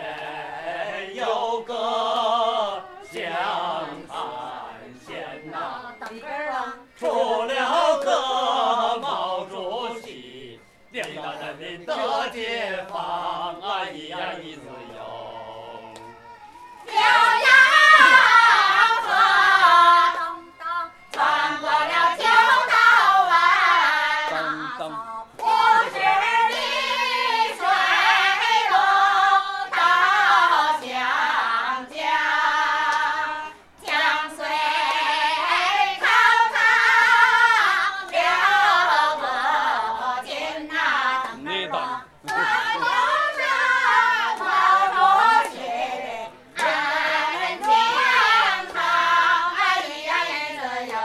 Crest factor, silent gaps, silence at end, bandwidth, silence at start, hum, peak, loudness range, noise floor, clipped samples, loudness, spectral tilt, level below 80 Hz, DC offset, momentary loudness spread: 20 dB; none; 0 s; 14 kHz; 0 s; none; 0 dBFS; 14 LU; -46 dBFS; under 0.1%; -19 LUFS; -1 dB/octave; -66 dBFS; under 0.1%; 18 LU